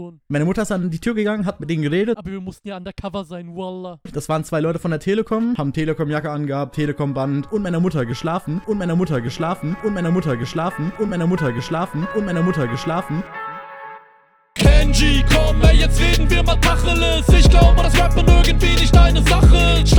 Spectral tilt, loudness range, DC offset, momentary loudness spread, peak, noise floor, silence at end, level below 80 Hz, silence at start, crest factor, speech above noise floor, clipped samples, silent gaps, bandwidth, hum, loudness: -5.5 dB/octave; 9 LU; under 0.1%; 16 LU; 0 dBFS; -53 dBFS; 0 s; -18 dBFS; 0 s; 16 dB; 38 dB; under 0.1%; none; 18.5 kHz; none; -18 LUFS